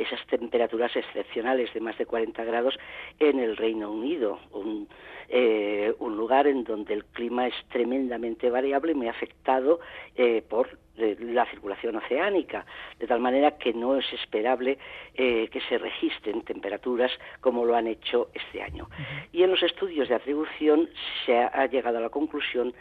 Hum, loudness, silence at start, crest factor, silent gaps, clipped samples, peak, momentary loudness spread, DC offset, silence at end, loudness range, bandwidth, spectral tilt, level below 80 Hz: none; -27 LUFS; 0 s; 18 dB; none; under 0.1%; -8 dBFS; 11 LU; under 0.1%; 0.1 s; 2 LU; 4.7 kHz; -7 dB/octave; -60 dBFS